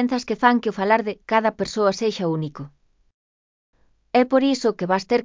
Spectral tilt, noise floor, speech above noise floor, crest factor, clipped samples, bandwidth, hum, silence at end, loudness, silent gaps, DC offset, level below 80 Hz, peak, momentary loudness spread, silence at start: -5.5 dB/octave; under -90 dBFS; over 69 dB; 20 dB; under 0.1%; 7.6 kHz; none; 0 s; -21 LUFS; 3.14-3.73 s; under 0.1%; -60 dBFS; -2 dBFS; 7 LU; 0 s